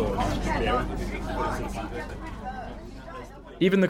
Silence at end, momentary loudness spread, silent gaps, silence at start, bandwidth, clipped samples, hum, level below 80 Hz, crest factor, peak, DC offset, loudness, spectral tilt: 0 s; 15 LU; none; 0 s; 16 kHz; under 0.1%; none; -36 dBFS; 18 dB; -10 dBFS; under 0.1%; -30 LUFS; -6.5 dB/octave